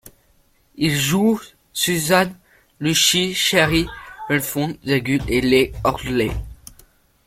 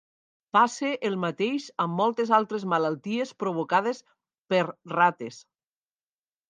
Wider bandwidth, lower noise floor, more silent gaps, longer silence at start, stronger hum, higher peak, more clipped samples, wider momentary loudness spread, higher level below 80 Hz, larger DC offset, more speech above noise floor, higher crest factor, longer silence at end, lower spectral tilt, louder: first, 16.5 kHz vs 9.8 kHz; second, -58 dBFS vs under -90 dBFS; second, none vs 4.38-4.45 s; second, 0.05 s vs 0.55 s; neither; first, -2 dBFS vs -6 dBFS; neither; first, 10 LU vs 7 LU; first, -40 dBFS vs -80 dBFS; neither; second, 40 dB vs over 64 dB; about the same, 18 dB vs 20 dB; second, 0.75 s vs 1.1 s; second, -3.5 dB/octave vs -5.5 dB/octave; first, -19 LUFS vs -26 LUFS